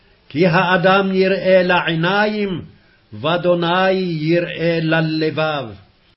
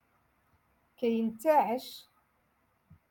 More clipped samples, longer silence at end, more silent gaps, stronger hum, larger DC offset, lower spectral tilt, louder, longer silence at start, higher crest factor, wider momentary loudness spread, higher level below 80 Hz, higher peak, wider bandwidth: neither; second, 0.4 s vs 1.1 s; neither; neither; neither; first, -10 dB/octave vs -5.5 dB/octave; first, -16 LUFS vs -30 LUFS; second, 0.35 s vs 1 s; about the same, 16 dB vs 20 dB; second, 10 LU vs 17 LU; first, -54 dBFS vs -76 dBFS; first, -2 dBFS vs -14 dBFS; second, 5.8 kHz vs 17.5 kHz